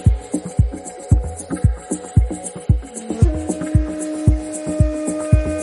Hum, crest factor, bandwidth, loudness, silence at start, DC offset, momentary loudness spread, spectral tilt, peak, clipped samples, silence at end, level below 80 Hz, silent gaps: none; 16 dB; 11.5 kHz; -20 LUFS; 0 s; under 0.1%; 7 LU; -7.5 dB/octave; -2 dBFS; under 0.1%; 0 s; -22 dBFS; none